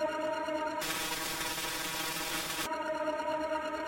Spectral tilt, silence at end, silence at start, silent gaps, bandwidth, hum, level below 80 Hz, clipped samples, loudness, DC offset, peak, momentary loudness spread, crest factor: -2 dB/octave; 0 s; 0 s; none; 17 kHz; none; -60 dBFS; under 0.1%; -34 LUFS; under 0.1%; -22 dBFS; 1 LU; 14 dB